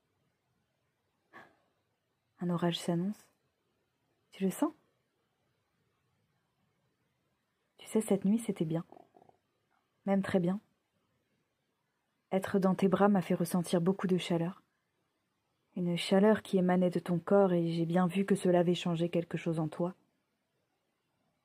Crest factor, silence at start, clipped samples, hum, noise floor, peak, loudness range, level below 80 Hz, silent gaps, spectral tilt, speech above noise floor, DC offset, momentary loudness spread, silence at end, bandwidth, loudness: 22 dB; 1.35 s; under 0.1%; none; -81 dBFS; -12 dBFS; 11 LU; -78 dBFS; none; -7 dB/octave; 51 dB; under 0.1%; 10 LU; 1.55 s; 15.5 kHz; -32 LUFS